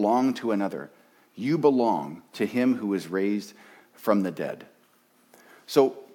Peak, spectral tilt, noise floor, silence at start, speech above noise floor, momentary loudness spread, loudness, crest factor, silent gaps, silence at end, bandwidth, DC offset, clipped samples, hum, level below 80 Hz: -8 dBFS; -6.5 dB/octave; -62 dBFS; 0 s; 37 dB; 14 LU; -26 LUFS; 18 dB; none; 0.1 s; 18 kHz; under 0.1%; under 0.1%; none; -80 dBFS